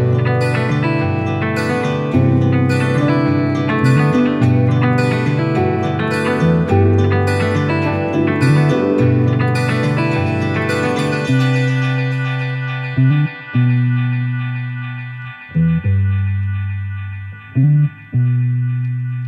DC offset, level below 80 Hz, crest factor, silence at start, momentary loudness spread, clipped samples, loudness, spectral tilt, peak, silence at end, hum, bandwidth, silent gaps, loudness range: under 0.1%; -46 dBFS; 14 dB; 0 s; 8 LU; under 0.1%; -16 LUFS; -8 dB/octave; -2 dBFS; 0 s; none; 10.5 kHz; none; 4 LU